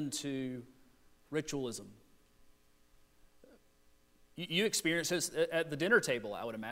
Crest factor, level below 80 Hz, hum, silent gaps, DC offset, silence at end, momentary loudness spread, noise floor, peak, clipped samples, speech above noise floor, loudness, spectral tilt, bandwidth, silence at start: 22 dB; -70 dBFS; none; none; under 0.1%; 0 s; 14 LU; -66 dBFS; -16 dBFS; under 0.1%; 31 dB; -34 LUFS; -3 dB/octave; 16 kHz; 0 s